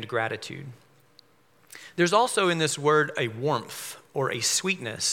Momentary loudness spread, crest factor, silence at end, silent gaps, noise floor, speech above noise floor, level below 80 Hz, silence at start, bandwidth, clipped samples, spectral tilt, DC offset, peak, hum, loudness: 16 LU; 20 dB; 0 s; none; -62 dBFS; 36 dB; -78 dBFS; 0 s; 17 kHz; under 0.1%; -3 dB/octave; under 0.1%; -6 dBFS; none; -25 LUFS